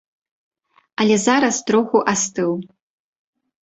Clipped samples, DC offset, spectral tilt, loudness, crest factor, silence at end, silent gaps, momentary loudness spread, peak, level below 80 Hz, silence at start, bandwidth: under 0.1%; under 0.1%; -3.5 dB/octave; -18 LUFS; 18 dB; 1 s; none; 8 LU; -2 dBFS; -62 dBFS; 1 s; 8.2 kHz